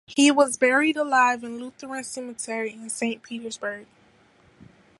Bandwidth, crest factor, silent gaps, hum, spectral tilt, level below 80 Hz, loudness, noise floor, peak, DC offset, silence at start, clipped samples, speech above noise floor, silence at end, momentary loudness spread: 11.5 kHz; 20 dB; none; none; -2 dB/octave; -72 dBFS; -24 LUFS; -58 dBFS; -6 dBFS; under 0.1%; 0.1 s; under 0.1%; 34 dB; 1.15 s; 15 LU